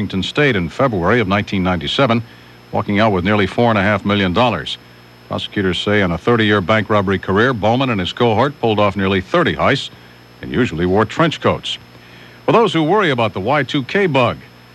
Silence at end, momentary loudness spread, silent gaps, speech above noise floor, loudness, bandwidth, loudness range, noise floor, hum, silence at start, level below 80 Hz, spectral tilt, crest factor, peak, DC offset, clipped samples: 0.3 s; 9 LU; none; 24 dB; -16 LUFS; 12.5 kHz; 2 LU; -40 dBFS; 60 Hz at -45 dBFS; 0 s; -44 dBFS; -6.5 dB/octave; 14 dB; -2 dBFS; under 0.1%; under 0.1%